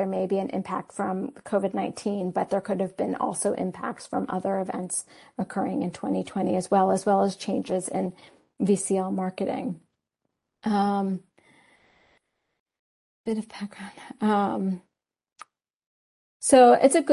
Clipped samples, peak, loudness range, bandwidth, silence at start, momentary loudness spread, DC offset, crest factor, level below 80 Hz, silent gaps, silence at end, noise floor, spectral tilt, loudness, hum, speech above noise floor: under 0.1%; -6 dBFS; 6 LU; 11.5 kHz; 0 s; 12 LU; under 0.1%; 20 dB; -68 dBFS; 12.60-12.66 s, 12.79-13.24 s, 15.75-15.80 s, 15.86-16.40 s; 0 s; -81 dBFS; -5.5 dB/octave; -26 LUFS; none; 56 dB